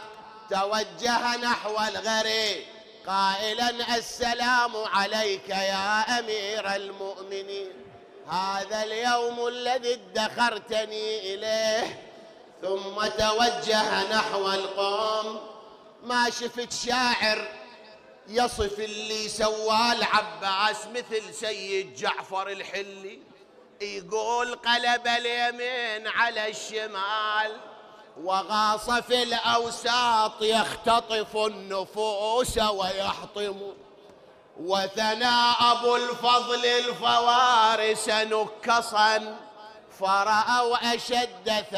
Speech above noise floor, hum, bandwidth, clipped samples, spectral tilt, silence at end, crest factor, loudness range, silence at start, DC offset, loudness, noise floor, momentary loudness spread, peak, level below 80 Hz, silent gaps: 27 dB; none; 16 kHz; under 0.1%; -2 dB/octave; 0 s; 20 dB; 6 LU; 0 s; under 0.1%; -25 LUFS; -53 dBFS; 11 LU; -8 dBFS; -56 dBFS; none